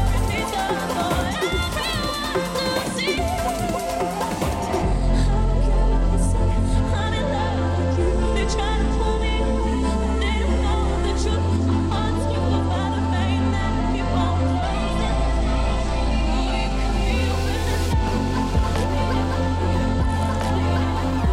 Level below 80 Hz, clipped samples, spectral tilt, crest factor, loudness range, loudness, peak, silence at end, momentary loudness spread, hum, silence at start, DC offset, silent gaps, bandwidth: -24 dBFS; under 0.1%; -6 dB/octave; 10 dB; 1 LU; -22 LUFS; -10 dBFS; 0 s; 2 LU; none; 0 s; under 0.1%; none; 15.5 kHz